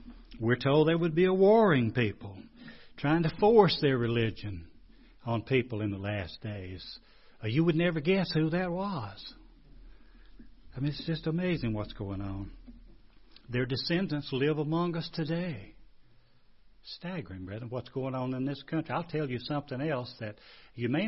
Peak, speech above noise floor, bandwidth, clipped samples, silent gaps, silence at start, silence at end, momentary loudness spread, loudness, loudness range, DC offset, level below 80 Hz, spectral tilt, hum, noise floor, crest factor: -8 dBFS; 29 dB; 5.8 kHz; under 0.1%; none; 0 s; 0 s; 19 LU; -30 LUFS; 10 LU; under 0.1%; -54 dBFS; -10.5 dB/octave; none; -58 dBFS; 22 dB